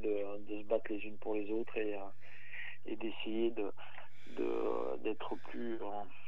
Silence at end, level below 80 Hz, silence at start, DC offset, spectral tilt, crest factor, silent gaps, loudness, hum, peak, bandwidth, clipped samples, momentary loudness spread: 0 s; -88 dBFS; 0 s; 2%; -7 dB/octave; 18 dB; none; -40 LUFS; none; -20 dBFS; 7.2 kHz; under 0.1%; 13 LU